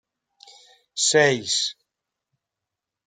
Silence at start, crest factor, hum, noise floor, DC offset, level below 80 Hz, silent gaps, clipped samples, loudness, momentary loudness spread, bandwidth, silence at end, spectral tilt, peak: 0.95 s; 20 dB; none; -86 dBFS; under 0.1%; -72 dBFS; none; under 0.1%; -20 LUFS; 11 LU; 9.6 kHz; 1.35 s; -2 dB/octave; -6 dBFS